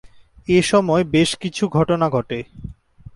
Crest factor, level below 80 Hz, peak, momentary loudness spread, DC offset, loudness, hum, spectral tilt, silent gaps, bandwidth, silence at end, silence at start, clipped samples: 16 dB; -46 dBFS; -4 dBFS; 20 LU; under 0.1%; -18 LUFS; none; -5.5 dB/octave; none; 11.5 kHz; 0.05 s; 0.5 s; under 0.1%